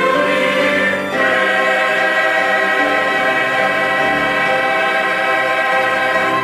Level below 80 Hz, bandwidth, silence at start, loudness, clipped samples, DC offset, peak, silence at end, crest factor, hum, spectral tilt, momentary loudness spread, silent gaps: -54 dBFS; 16 kHz; 0 s; -14 LUFS; under 0.1%; under 0.1%; -4 dBFS; 0 s; 12 dB; none; -3.5 dB/octave; 1 LU; none